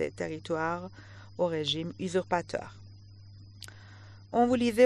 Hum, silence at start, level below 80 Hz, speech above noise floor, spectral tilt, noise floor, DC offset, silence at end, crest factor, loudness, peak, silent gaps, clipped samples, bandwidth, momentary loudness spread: none; 0 s; -62 dBFS; 21 dB; -5.5 dB/octave; -50 dBFS; under 0.1%; 0 s; 20 dB; -31 LUFS; -10 dBFS; none; under 0.1%; 11.5 kHz; 25 LU